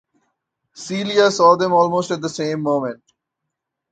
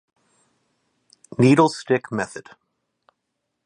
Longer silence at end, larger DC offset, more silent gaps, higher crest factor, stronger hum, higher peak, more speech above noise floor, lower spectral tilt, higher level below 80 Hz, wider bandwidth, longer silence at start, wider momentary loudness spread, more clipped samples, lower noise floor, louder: second, 0.95 s vs 1.25 s; neither; neither; about the same, 18 dB vs 22 dB; neither; about the same, 0 dBFS vs -2 dBFS; first, 63 dB vs 59 dB; second, -4.5 dB/octave vs -6.5 dB/octave; about the same, -66 dBFS vs -64 dBFS; second, 9.2 kHz vs 11 kHz; second, 0.75 s vs 1.4 s; second, 14 LU vs 19 LU; neither; about the same, -80 dBFS vs -78 dBFS; first, -17 LUFS vs -20 LUFS